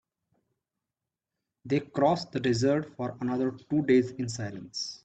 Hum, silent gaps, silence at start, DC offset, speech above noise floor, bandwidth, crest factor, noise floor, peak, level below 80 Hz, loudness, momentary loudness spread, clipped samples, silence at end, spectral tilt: none; none; 1.65 s; under 0.1%; 61 dB; 8.8 kHz; 18 dB; -89 dBFS; -12 dBFS; -64 dBFS; -29 LUFS; 11 LU; under 0.1%; 0.1 s; -6 dB/octave